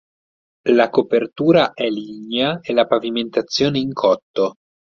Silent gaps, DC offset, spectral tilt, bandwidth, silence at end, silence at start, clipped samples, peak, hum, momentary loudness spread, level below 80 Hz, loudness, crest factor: 4.23-4.34 s; under 0.1%; -5.5 dB/octave; 7.4 kHz; 0.35 s; 0.65 s; under 0.1%; -2 dBFS; none; 8 LU; -58 dBFS; -18 LUFS; 18 dB